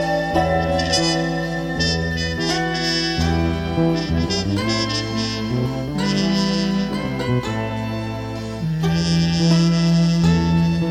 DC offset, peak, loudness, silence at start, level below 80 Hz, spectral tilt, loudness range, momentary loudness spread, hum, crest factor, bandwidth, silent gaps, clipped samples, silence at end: under 0.1%; -4 dBFS; -20 LUFS; 0 s; -34 dBFS; -5.5 dB/octave; 3 LU; 7 LU; none; 14 dB; 11 kHz; none; under 0.1%; 0 s